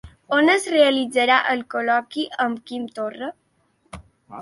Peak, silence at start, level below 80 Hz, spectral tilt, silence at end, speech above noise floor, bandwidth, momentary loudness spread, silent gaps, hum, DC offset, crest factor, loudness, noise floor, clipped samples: -4 dBFS; 0.05 s; -56 dBFS; -3 dB/octave; 0 s; 43 dB; 11.5 kHz; 13 LU; none; none; under 0.1%; 18 dB; -20 LUFS; -63 dBFS; under 0.1%